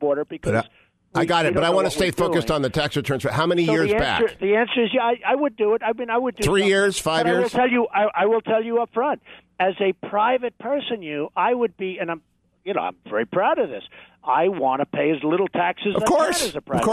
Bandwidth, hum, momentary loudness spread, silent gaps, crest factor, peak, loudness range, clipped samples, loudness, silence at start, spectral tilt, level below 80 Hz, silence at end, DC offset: 13.5 kHz; none; 8 LU; none; 14 dB; -6 dBFS; 4 LU; under 0.1%; -21 LUFS; 0 s; -4.5 dB/octave; -48 dBFS; 0 s; under 0.1%